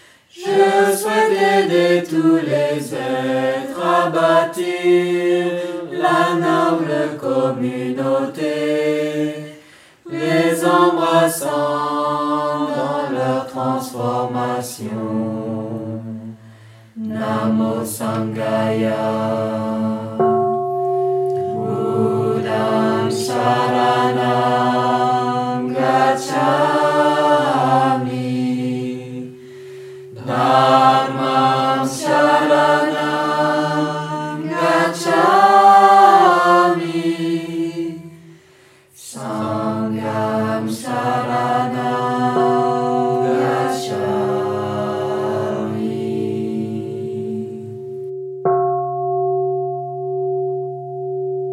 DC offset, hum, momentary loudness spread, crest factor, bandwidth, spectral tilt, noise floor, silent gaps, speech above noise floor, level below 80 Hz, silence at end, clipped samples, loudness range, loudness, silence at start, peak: under 0.1%; none; 12 LU; 18 dB; 16 kHz; -5.5 dB/octave; -49 dBFS; none; 32 dB; -70 dBFS; 0 s; under 0.1%; 9 LU; -17 LUFS; 0.35 s; 0 dBFS